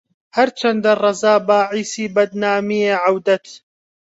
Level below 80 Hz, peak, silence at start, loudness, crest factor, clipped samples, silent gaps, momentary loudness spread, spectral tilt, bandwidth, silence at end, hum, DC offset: -66 dBFS; -2 dBFS; 0.35 s; -17 LUFS; 14 dB; under 0.1%; none; 6 LU; -4 dB/octave; 8 kHz; 0.6 s; none; under 0.1%